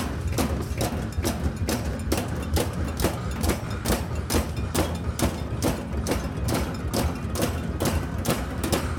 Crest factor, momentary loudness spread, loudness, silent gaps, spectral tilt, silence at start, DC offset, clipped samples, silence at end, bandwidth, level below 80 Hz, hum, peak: 18 dB; 2 LU; -27 LUFS; none; -5 dB/octave; 0 s; under 0.1%; under 0.1%; 0 s; over 20 kHz; -32 dBFS; none; -8 dBFS